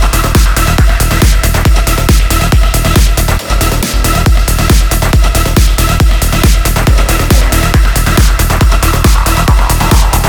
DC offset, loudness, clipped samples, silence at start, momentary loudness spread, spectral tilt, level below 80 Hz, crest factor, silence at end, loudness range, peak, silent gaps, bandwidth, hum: 0.3%; -10 LUFS; 0.3%; 0 s; 1 LU; -4.5 dB/octave; -10 dBFS; 8 dB; 0 s; 1 LU; 0 dBFS; none; over 20 kHz; none